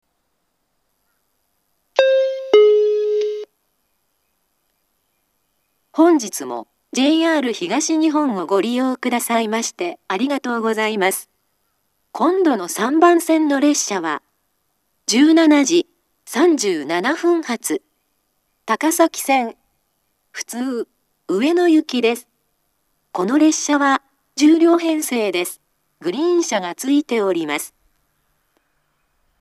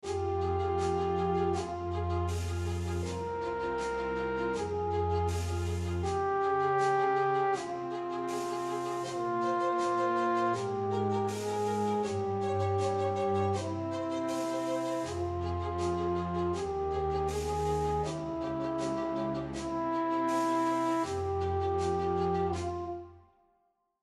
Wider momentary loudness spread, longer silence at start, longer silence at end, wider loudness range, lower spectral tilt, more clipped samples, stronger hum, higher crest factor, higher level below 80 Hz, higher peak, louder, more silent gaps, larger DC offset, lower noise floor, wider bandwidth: first, 15 LU vs 6 LU; first, 1.95 s vs 0.05 s; first, 1.75 s vs 0.85 s; first, 5 LU vs 2 LU; second, -3 dB/octave vs -6.5 dB/octave; neither; neither; about the same, 18 dB vs 14 dB; second, -76 dBFS vs -54 dBFS; first, 0 dBFS vs -18 dBFS; first, -18 LUFS vs -32 LUFS; neither; neither; second, -71 dBFS vs -75 dBFS; about the same, 13.5 kHz vs 13 kHz